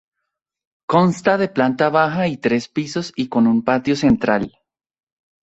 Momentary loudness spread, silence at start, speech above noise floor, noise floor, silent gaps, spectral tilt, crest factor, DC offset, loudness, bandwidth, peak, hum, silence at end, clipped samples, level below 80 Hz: 8 LU; 0.9 s; 62 dB; -79 dBFS; none; -6.5 dB/octave; 16 dB; under 0.1%; -18 LUFS; 8.2 kHz; -2 dBFS; none; 0.95 s; under 0.1%; -50 dBFS